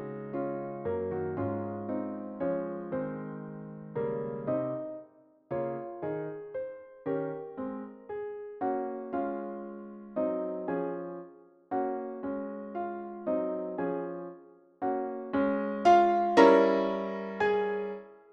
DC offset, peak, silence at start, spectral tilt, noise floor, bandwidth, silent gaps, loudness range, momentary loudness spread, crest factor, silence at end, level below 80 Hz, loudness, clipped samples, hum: under 0.1%; -6 dBFS; 0 s; -7 dB/octave; -57 dBFS; 8.4 kHz; none; 11 LU; 17 LU; 24 dB; 0.15 s; -70 dBFS; -31 LUFS; under 0.1%; none